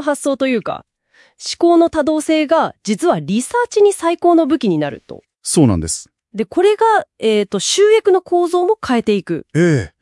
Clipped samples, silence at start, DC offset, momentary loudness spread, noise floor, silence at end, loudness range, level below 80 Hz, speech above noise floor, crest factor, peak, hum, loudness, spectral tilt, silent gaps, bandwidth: under 0.1%; 0 s; under 0.1%; 12 LU; -53 dBFS; 0.15 s; 2 LU; -48 dBFS; 38 dB; 14 dB; 0 dBFS; none; -15 LUFS; -5 dB/octave; none; 12 kHz